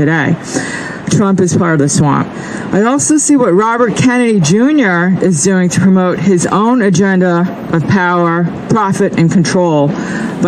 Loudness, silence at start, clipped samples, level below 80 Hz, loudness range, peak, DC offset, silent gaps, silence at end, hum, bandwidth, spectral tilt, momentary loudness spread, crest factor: -11 LUFS; 0 s; under 0.1%; -48 dBFS; 2 LU; 0 dBFS; under 0.1%; none; 0 s; none; 12 kHz; -5.5 dB/octave; 6 LU; 10 dB